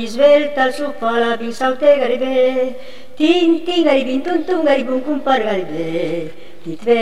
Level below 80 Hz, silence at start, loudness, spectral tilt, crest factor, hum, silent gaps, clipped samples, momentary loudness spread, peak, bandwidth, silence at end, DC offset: -58 dBFS; 0 s; -16 LUFS; -5 dB/octave; 16 dB; none; none; under 0.1%; 10 LU; -2 dBFS; 12.5 kHz; 0 s; 4%